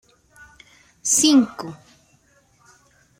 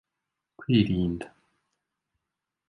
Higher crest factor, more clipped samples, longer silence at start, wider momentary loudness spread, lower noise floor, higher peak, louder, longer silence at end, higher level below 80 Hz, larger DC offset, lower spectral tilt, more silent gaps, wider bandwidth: about the same, 20 dB vs 22 dB; neither; first, 1.05 s vs 0.6 s; first, 21 LU vs 18 LU; second, -59 dBFS vs -86 dBFS; first, -4 dBFS vs -10 dBFS; first, -17 LUFS vs -26 LUFS; about the same, 1.45 s vs 1.4 s; second, -64 dBFS vs -50 dBFS; neither; second, -2 dB/octave vs -8.5 dB/octave; neither; first, 16 kHz vs 11 kHz